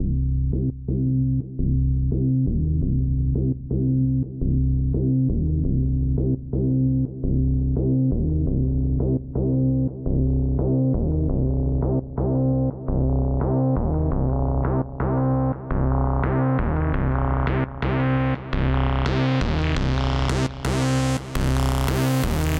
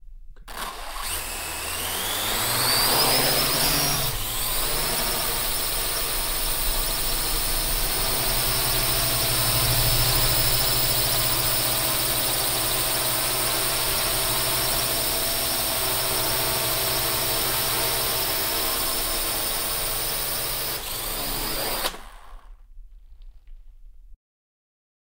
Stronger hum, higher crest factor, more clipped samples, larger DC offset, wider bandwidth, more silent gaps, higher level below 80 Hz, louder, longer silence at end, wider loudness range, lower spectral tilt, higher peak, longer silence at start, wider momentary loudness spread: neither; second, 10 dB vs 16 dB; neither; neither; about the same, 15.5 kHz vs 16 kHz; neither; first, -26 dBFS vs -36 dBFS; about the same, -23 LUFS vs -22 LUFS; second, 0 s vs 1 s; second, 0 LU vs 6 LU; first, -7.5 dB/octave vs -1.5 dB/octave; second, -12 dBFS vs -8 dBFS; about the same, 0 s vs 0.05 s; second, 3 LU vs 7 LU